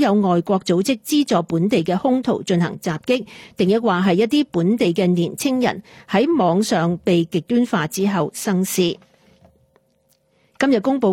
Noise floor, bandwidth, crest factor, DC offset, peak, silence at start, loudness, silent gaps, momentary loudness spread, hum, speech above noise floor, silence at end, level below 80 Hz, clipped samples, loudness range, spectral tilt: -62 dBFS; 16.5 kHz; 14 dB; under 0.1%; -4 dBFS; 0 s; -19 LUFS; none; 5 LU; none; 44 dB; 0 s; -60 dBFS; under 0.1%; 4 LU; -5.5 dB/octave